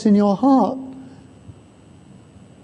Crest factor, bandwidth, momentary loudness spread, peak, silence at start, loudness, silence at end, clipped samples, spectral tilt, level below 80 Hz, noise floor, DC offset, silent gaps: 16 dB; 8.4 kHz; 21 LU; -4 dBFS; 0 s; -17 LUFS; 1.15 s; under 0.1%; -8.5 dB/octave; -56 dBFS; -47 dBFS; under 0.1%; none